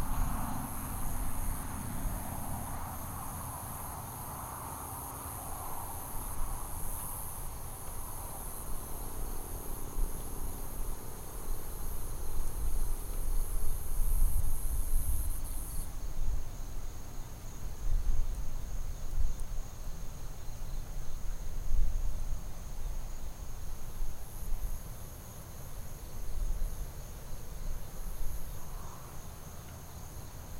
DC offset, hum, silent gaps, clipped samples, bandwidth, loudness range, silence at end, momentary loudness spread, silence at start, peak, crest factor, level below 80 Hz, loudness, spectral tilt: under 0.1%; none; none; under 0.1%; 16 kHz; 7 LU; 0 s; 10 LU; 0 s; -14 dBFS; 18 dB; -34 dBFS; -41 LUFS; -4.5 dB/octave